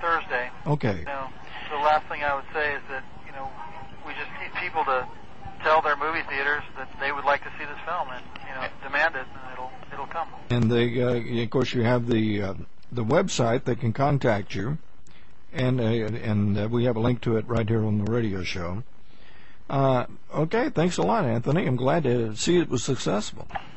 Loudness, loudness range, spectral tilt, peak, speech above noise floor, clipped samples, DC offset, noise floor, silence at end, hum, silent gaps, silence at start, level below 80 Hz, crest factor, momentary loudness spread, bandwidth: -26 LUFS; 4 LU; -6 dB/octave; -10 dBFS; 28 dB; under 0.1%; 2%; -53 dBFS; 0 s; none; none; 0 s; -50 dBFS; 18 dB; 15 LU; 8.4 kHz